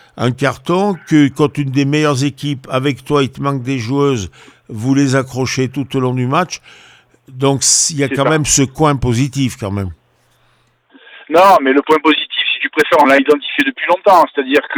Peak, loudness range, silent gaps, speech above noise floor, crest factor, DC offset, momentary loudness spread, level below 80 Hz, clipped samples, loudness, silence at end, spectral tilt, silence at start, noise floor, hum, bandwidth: 0 dBFS; 5 LU; none; 42 dB; 14 dB; under 0.1%; 10 LU; -44 dBFS; under 0.1%; -14 LUFS; 0 s; -4 dB/octave; 0.15 s; -56 dBFS; none; over 20 kHz